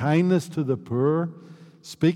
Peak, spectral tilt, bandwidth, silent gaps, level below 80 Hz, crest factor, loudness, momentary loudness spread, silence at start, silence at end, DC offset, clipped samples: -10 dBFS; -7.5 dB/octave; 13.5 kHz; none; -68 dBFS; 14 dB; -24 LUFS; 17 LU; 0 s; 0 s; under 0.1%; under 0.1%